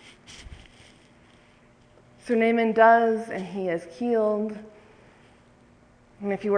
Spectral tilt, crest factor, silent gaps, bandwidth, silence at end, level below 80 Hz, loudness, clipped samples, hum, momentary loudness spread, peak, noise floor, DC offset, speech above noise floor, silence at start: -6.5 dB/octave; 22 dB; none; 10 kHz; 0 s; -58 dBFS; -23 LUFS; under 0.1%; none; 27 LU; -6 dBFS; -56 dBFS; under 0.1%; 34 dB; 0.3 s